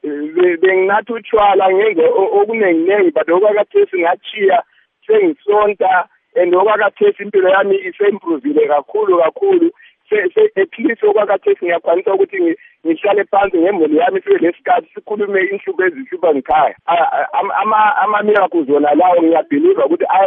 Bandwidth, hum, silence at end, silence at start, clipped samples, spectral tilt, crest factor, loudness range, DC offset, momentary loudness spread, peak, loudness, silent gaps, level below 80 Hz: 3.8 kHz; none; 0 s; 0.05 s; under 0.1%; -9 dB/octave; 12 dB; 2 LU; under 0.1%; 5 LU; -2 dBFS; -14 LUFS; none; -56 dBFS